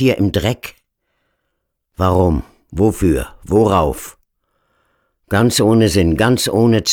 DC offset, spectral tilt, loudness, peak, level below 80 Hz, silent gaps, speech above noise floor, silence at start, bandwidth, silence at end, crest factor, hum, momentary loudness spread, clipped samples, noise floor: under 0.1%; -5.5 dB/octave; -15 LUFS; -2 dBFS; -34 dBFS; none; 58 dB; 0 s; 19 kHz; 0 s; 14 dB; none; 12 LU; under 0.1%; -72 dBFS